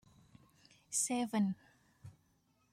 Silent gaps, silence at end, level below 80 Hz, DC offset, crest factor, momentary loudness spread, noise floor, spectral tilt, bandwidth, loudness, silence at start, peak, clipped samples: none; 0.6 s; -78 dBFS; under 0.1%; 20 dB; 24 LU; -75 dBFS; -4 dB/octave; 16 kHz; -36 LUFS; 0.9 s; -22 dBFS; under 0.1%